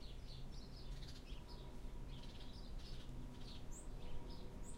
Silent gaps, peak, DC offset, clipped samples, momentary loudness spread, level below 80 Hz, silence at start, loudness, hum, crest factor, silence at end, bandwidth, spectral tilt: none; -34 dBFS; under 0.1%; under 0.1%; 1 LU; -52 dBFS; 0 s; -55 LUFS; none; 14 dB; 0 s; 15.5 kHz; -5 dB/octave